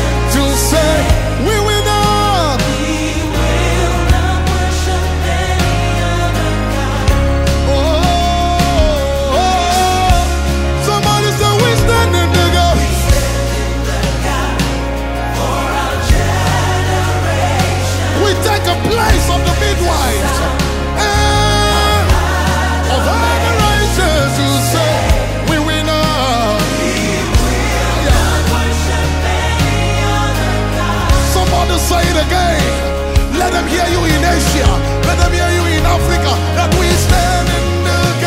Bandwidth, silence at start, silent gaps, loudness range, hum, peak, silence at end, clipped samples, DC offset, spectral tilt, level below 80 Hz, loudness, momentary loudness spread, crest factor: 16.5 kHz; 0 s; none; 2 LU; none; 0 dBFS; 0 s; under 0.1%; under 0.1%; -4.5 dB/octave; -18 dBFS; -13 LUFS; 4 LU; 12 dB